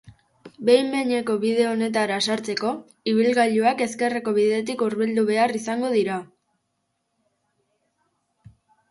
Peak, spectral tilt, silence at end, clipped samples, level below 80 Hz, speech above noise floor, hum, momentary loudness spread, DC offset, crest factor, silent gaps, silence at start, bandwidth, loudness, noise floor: -4 dBFS; -4.5 dB/octave; 2.65 s; under 0.1%; -68 dBFS; 53 dB; none; 7 LU; under 0.1%; 20 dB; none; 0.45 s; 11.5 kHz; -22 LUFS; -75 dBFS